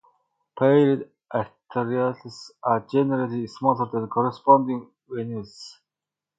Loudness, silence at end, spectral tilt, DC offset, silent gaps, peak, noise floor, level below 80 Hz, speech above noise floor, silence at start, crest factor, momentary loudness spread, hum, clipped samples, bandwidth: -23 LUFS; 0.65 s; -8 dB/octave; under 0.1%; none; -2 dBFS; -89 dBFS; -66 dBFS; 66 dB; 0.55 s; 22 dB; 17 LU; none; under 0.1%; 7.8 kHz